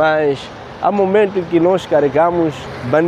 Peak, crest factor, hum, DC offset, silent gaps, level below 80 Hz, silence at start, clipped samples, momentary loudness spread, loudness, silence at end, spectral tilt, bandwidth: 0 dBFS; 14 dB; none; under 0.1%; none; -48 dBFS; 0 s; under 0.1%; 8 LU; -15 LUFS; 0 s; -7 dB/octave; 10 kHz